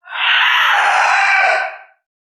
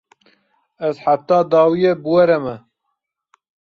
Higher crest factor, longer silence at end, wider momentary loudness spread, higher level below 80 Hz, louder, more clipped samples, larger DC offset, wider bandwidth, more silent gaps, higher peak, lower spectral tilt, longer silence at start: about the same, 14 dB vs 16 dB; second, 0.55 s vs 1.1 s; second, 5 LU vs 11 LU; second, under -90 dBFS vs -60 dBFS; first, -12 LUFS vs -16 LUFS; neither; neither; first, 13.5 kHz vs 6.6 kHz; neither; about the same, -2 dBFS vs -2 dBFS; second, 3.5 dB/octave vs -8 dB/octave; second, 0.05 s vs 0.8 s